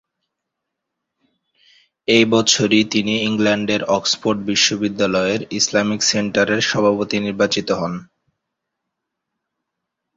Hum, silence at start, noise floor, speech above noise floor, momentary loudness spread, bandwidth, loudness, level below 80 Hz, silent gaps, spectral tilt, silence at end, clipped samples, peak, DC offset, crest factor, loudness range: none; 2.1 s; -80 dBFS; 62 dB; 7 LU; 8 kHz; -17 LUFS; -56 dBFS; none; -3 dB/octave; 2.15 s; under 0.1%; 0 dBFS; under 0.1%; 20 dB; 5 LU